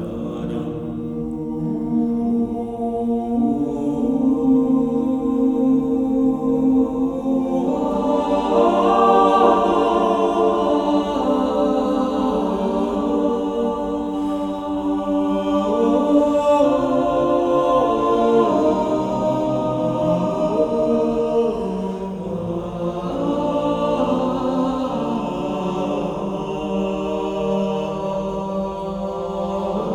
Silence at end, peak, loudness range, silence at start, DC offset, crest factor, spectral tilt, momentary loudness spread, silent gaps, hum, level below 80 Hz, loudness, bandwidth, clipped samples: 0 s; -2 dBFS; 6 LU; 0 s; under 0.1%; 18 dB; -7.5 dB/octave; 9 LU; none; none; -44 dBFS; -20 LUFS; 10.5 kHz; under 0.1%